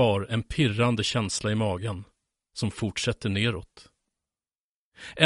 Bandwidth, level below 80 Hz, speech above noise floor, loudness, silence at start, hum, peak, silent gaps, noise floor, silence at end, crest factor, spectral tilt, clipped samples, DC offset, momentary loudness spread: 11.5 kHz; -50 dBFS; over 64 dB; -27 LUFS; 0 s; none; -4 dBFS; 4.58-4.91 s; under -90 dBFS; 0 s; 24 dB; -5 dB/octave; under 0.1%; under 0.1%; 15 LU